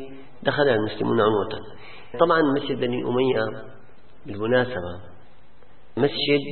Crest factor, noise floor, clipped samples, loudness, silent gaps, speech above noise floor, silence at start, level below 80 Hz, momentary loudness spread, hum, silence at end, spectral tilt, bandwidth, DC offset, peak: 22 dB; -55 dBFS; under 0.1%; -23 LUFS; none; 32 dB; 0 s; -56 dBFS; 18 LU; none; 0 s; -10.5 dB/octave; 4.4 kHz; 1%; -2 dBFS